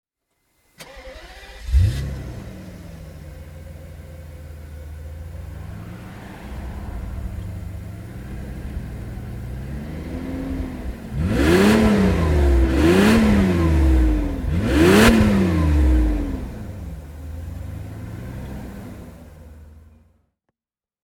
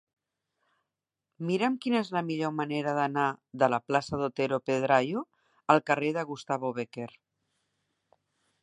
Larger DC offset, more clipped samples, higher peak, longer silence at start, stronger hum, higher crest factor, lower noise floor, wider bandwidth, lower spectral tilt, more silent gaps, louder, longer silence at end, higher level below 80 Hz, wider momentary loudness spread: neither; neither; first, 0 dBFS vs -6 dBFS; second, 0.8 s vs 1.4 s; neither; about the same, 20 dB vs 24 dB; about the same, under -90 dBFS vs -88 dBFS; first, 16.5 kHz vs 11 kHz; about the same, -6.5 dB/octave vs -6 dB/octave; neither; first, -19 LUFS vs -29 LUFS; second, 1.25 s vs 1.55 s; first, -26 dBFS vs -70 dBFS; first, 24 LU vs 11 LU